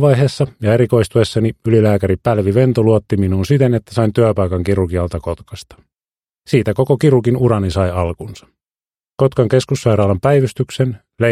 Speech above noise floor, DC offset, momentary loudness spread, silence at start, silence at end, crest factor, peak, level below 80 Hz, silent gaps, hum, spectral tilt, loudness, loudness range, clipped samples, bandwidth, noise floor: over 76 dB; under 0.1%; 8 LU; 0 s; 0 s; 14 dB; 0 dBFS; -40 dBFS; none; none; -7.5 dB/octave; -15 LUFS; 3 LU; under 0.1%; 14 kHz; under -90 dBFS